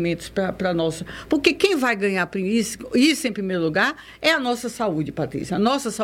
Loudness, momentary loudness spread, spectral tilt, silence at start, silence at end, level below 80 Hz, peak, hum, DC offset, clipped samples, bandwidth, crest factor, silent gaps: -22 LUFS; 7 LU; -4.5 dB/octave; 0 s; 0 s; -52 dBFS; -4 dBFS; none; under 0.1%; under 0.1%; 16.5 kHz; 18 dB; none